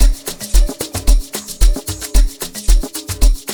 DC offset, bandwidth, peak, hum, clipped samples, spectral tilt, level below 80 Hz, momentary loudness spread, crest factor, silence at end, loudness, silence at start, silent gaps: under 0.1%; over 20 kHz; 0 dBFS; none; under 0.1%; -4 dB/octave; -14 dBFS; 6 LU; 14 dB; 0 s; -19 LUFS; 0 s; none